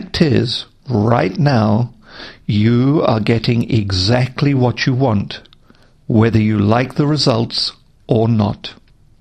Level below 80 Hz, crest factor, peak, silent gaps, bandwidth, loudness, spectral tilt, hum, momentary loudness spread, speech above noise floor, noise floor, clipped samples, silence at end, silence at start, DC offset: -42 dBFS; 16 dB; 0 dBFS; none; 9.4 kHz; -15 LUFS; -7 dB/octave; none; 9 LU; 34 dB; -48 dBFS; under 0.1%; 0.45 s; 0 s; under 0.1%